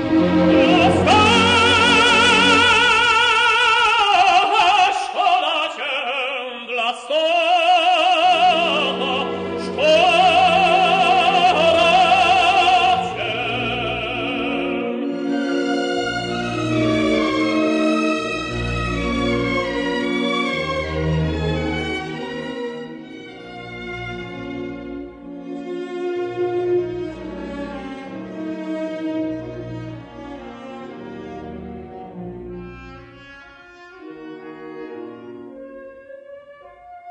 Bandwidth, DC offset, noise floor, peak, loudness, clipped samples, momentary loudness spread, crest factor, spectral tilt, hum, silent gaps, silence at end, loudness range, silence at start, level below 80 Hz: 10 kHz; under 0.1%; -43 dBFS; -4 dBFS; -17 LUFS; under 0.1%; 22 LU; 16 dB; -4 dB/octave; none; none; 0 s; 22 LU; 0 s; -42 dBFS